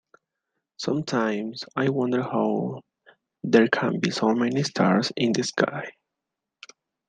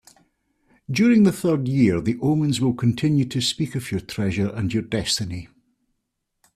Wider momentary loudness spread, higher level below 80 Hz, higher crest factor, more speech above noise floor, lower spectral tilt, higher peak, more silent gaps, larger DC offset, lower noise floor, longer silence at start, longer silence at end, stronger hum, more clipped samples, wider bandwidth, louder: about the same, 12 LU vs 10 LU; second, -70 dBFS vs -52 dBFS; first, 22 dB vs 16 dB; first, 62 dB vs 56 dB; about the same, -5.5 dB/octave vs -5.5 dB/octave; first, -2 dBFS vs -6 dBFS; neither; neither; first, -85 dBFS vs -77 dBFS; about the same, 0.8 s vs 0.9 s; about the same, 1.2 s vs 1.1 s; neither; neither; second, 9.4 kHz vs 14.5 kHz; second, -24 LUFS vs -21 LUFS